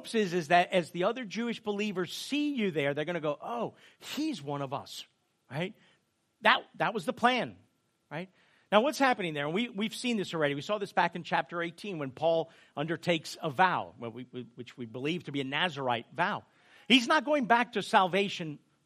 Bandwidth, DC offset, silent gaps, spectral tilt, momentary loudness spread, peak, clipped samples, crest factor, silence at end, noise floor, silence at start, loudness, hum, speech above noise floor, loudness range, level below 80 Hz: 15 kHz; under 0.1%; none; -4.5 dB/octave; 16 LU; -6 dBFS; under 0.1%; 24 dB; 0.3 s; -72 dBFS; 0 s; -30 LUFS; none; 42 dB; 6 LU; -80 dBFS